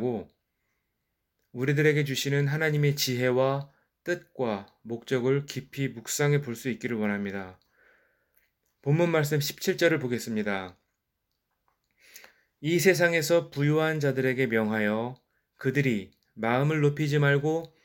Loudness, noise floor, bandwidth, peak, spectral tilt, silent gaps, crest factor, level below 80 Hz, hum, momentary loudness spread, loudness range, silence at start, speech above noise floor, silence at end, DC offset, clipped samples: -27 LUFS; -81 dBFS; 17 kHz; -8 dBFS; -5.5 dB/octave; none; 20 dB; -70 dBFS; none; 12 LU; 5 LU; 0 s; 54 dB; 0.2 s; under 0.1%; under 0.1%